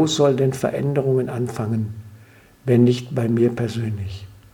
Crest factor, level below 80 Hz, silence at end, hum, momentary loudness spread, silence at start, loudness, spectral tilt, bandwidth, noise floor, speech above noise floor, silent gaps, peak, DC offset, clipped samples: 16 dB; -54 dBFS; 0.2 s; none; 14 LU; 0 s; -21 LUFS; -6.5 dB/octave; 17.5 kHz; -48 dBFS; 29 dB; none; -4 dBFS; under 0.1%; under 0.1%